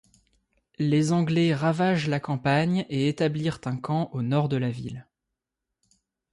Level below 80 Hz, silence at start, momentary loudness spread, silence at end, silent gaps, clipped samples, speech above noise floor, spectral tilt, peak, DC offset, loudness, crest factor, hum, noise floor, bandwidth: -62 dBFS; 0.8 s; 8 LU; 1.3 s; none; under 0.1%; 61 dB; -7 dB/octave; -12 dBFS; under 0.1%; -25 LUFS; 14 dB; none; -85 dBFS; 11.5 kHz